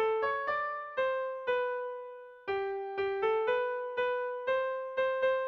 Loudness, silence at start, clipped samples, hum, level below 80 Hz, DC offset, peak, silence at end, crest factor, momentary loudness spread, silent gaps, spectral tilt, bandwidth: -33 LUFS; 0 s; under 0.1%; none; -72 dBFS; under 0.1%; -20 dBFS; 0 s; 12 dB; 7 LU; none; -5 dB/octave; 6 kHz